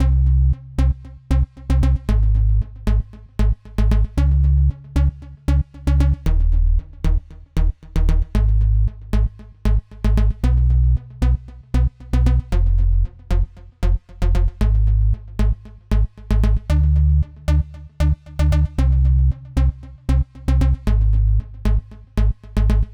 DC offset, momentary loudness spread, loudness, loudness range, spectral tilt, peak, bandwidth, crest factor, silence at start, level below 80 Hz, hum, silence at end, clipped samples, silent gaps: under 0.1%; 7 LU; -20 LUFS; 2 LU; -8 dB/octave; -4 dBFS; 7 kHz; 12 dB; 0 s; -18 dBFS; none; 0 s; under 0.1%; none